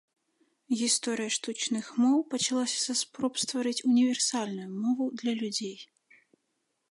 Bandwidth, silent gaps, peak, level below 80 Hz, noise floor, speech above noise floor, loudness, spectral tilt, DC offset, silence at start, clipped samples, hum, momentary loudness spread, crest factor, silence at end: 11.5 kHz; none; -14 dBFS; -82 dBFS; -79 dBFS; 50 dB; -29 LUFS; -2.5 dB/octave; under 0.1%; 0.7 s; under 0.1%; none; 8 LU; 16 dB; 1.05 s